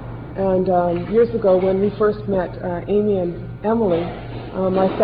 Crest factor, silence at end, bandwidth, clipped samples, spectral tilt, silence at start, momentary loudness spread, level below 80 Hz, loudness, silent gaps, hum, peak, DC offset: 14 dB; 0 s; 5 kHz; under 0.1%; -11 dB/octave; 0 s; 10 LU; -40 dBFS; -19 LUFS; none; none; -6 dBFS; 0.2%